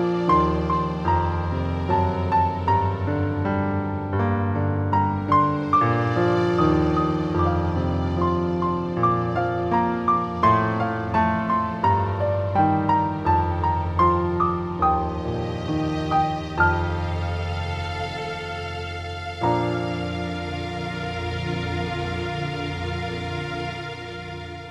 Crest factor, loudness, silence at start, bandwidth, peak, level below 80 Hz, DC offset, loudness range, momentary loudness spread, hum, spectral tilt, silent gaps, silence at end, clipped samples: 16 dB; -23 LUFS; 0 s; 8.8 kHz; -6 dBFS; -40 dBFS; under 0.1%; 6 LU; 9 LU; none; -8 dB/octave; none; 0 s; under 0.1%